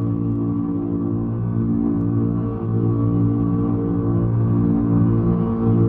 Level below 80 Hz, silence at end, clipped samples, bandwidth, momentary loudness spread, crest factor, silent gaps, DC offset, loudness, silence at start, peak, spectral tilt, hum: -36 dBFS; 0 s; under 0.1%; 2.8 kHz; 5 LU; 12 dB; none; under 0.1%; -20 LUFS; 0 s; -8 dBFS; -14 dB/octave; none